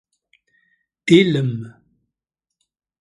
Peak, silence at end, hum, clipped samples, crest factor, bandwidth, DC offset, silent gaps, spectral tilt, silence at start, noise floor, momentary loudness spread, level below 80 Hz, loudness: 0 dBFS; 1.3 s; none; under 0.1%; 22 dB; 11 kHz; under 0.1%; none; -6.5 dB/octave; 1.05 s; -84 dBFS; 19 LU; -62 dBFS; -17 LUFS